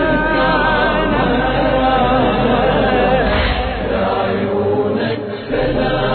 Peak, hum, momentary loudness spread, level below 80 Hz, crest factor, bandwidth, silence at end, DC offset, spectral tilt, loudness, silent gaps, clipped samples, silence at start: -2 dBFS; none; 5 LU; -26 dBFS; 12 dB; 4.6 kHz; 0 s; under 0.1%; -9.5 dB/octave; -15 LUFS; none; under 0.1%; 0 s